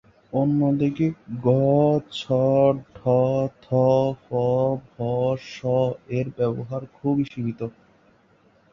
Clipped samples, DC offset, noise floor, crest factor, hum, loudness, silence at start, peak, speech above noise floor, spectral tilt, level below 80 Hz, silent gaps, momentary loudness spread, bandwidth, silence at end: under 0.1%; under 0.1%; -59 dBFS; 16 dB; none; -23 LUFS; 0.35 s; -6 dBFS; 37 dB; -9 dB/octave; -58 dBFS; none; 10 LU; 7.4 kHz; 1.05 s